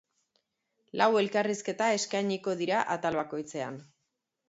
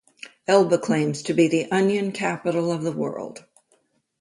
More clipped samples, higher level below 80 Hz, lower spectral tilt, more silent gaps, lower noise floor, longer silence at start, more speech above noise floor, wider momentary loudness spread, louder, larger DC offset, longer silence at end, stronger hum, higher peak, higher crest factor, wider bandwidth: neither; second, -74 dBFS vs -68 dBFS; second, -4 dB/octave vs -5.5 dB/octave; neither; first, -82 dBFS vs -66 dBFS; first, 0.95 s vs 0.25 s; first, 53 dB vs 44 dB; about the same, 12 LU vs 14 LU; second, -30 LUFS vs -22 LUFS; neither; second, 0.65 s vs 0.8 s; neither; second, -10 dBFS vs -4 dBFS; about the same, 22 dB vs 20 dB; second, 8.2 kHz vs 11.5 kHz